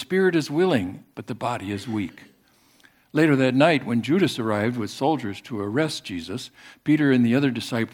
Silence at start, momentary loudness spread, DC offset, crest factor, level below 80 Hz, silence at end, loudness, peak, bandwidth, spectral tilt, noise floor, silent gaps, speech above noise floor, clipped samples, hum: 0 s; 13 LU; under 0.1%; 20 dB; -66 dBFS; 0.05 s; -23 LUFS; -2 dBFS; 16.5 kHz; -6 dB/octave; -59 dBFS; none; 37 dB; under 0.1%; none